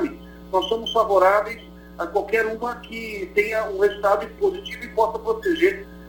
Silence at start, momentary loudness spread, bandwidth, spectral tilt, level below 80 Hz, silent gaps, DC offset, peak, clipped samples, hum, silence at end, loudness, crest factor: 0 s; 13 LU; 18 kHz; -4.5 dB/octave; -48 dBFS; none; under 0.1%; -4 dBFS; under 0.1%; 60 Hz at -45 dBFS; 0 s; -22 LUFS; 18 dB